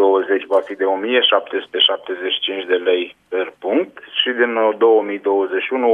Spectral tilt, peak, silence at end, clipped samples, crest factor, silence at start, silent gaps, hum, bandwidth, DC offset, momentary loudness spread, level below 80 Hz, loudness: -4.5 dB/octave; -2 dBFS; 0 s; under 0.1%; 16 dB; 0 s; none; none; 3.9 kHz; under 0.1%; 8 LU; -74 dBFS; -18 LUFS